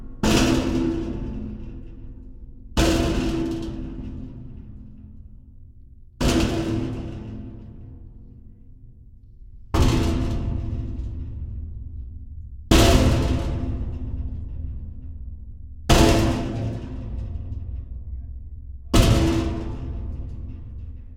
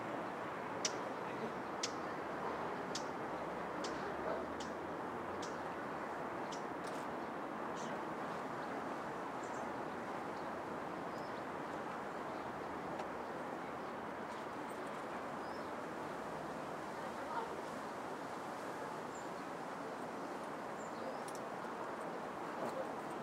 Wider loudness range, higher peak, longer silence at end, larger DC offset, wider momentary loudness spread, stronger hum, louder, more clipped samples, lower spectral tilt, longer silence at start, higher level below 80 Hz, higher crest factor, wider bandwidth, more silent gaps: about the same, 5 LU vs 3 LU; first, -2 dBFS vs -22 dBFS; about the same, 0 s vs 0 s; neither; first, 23 LU vs 3 LU; neither; first, -24 LUFS vs -44 LUFS; neither; first, -5.5 dB/octave vs -4 dB/octave; about the same, 0 s vs 0 s; first, -30 dBFS vs -74 dBFS; about the same, 22 dB vs 22 dB; about the same, 16.5 kHz vs 16 kHz; neither